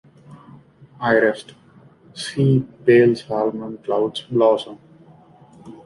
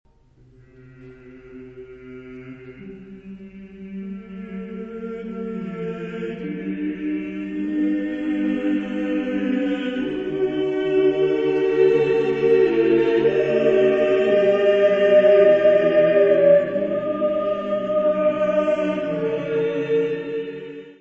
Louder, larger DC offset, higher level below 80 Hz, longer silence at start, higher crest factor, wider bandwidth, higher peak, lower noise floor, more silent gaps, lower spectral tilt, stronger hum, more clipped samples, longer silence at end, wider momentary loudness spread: about the same, -19 LUFS vs -20 LUFS; neither; about the same, -60 dBFS vs -56 dBFS; second, 0.3 s vs 1 s; about the same, 18 dB vs 16 dB; first, 11 kHz vs 7.4 kHz; about the same, -2 dBFS vs -4 dBFS; second, -49 dBFS vs -53 dBFS; neither; about the same, -7 dB/octave vs -7.5 dB/octave; neither; neither; about the same, 0.1 s vs 0.1 s; second, 16 LU vs 23 LU